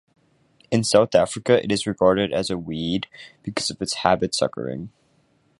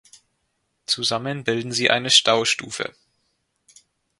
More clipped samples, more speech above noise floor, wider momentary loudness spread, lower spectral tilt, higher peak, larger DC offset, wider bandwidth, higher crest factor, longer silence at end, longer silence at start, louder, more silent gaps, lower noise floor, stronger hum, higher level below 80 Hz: neither; second, 41 dB vs 51 dB; about the same, 13 LU vs 15 LU; first, -4.5 dB/octave vs -2 dB/octave; about the same, -2 dBFS vs 0 dBFS; neither; about the same, 11.5 kHz vs 11.5 kHz; about the same, 22 dB vs 24 dB; second, 0.7 s vs 1.3 s; second, 0.7 s vs 0.9 s; about the same, -22 LUFS vs -20 LUFS; neither; second, -63 dBFS vs -73 dBFS; neither; first, -52 dBFS vs -66 dBFS